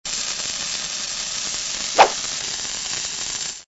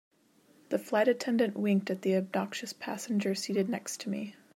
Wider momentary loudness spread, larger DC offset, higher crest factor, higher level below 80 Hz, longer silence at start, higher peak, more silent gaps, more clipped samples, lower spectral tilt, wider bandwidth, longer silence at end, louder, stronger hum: about the same, 8 LU vs 10 LU; neither; first, 24 dB vs 18 dB; first, -52 dBFS vs -82 dBFS; second, 0.05 s vs 0.7 s; first, 0 dBFS vs -14 dBFS; neither; neither; second, 0.5 dB/octave vs -5 dB/octave; second, 8.2 kHz vs 16 kHz; second, 0.05 s vs 0.25 s; first, -22 LUFS vs -31 LUFS; neither